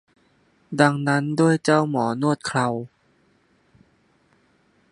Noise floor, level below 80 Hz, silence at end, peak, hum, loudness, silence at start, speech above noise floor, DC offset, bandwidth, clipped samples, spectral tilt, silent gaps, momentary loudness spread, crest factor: -62 dBFS; -68 dBFS; 2.05 s; -2 dBFS; none; -21 LUFS; 0.7 s; 42 dB; under 0.1%; 11 kHz; under 0.1%; -6 dB/octave; none; 11 LU; 22 dB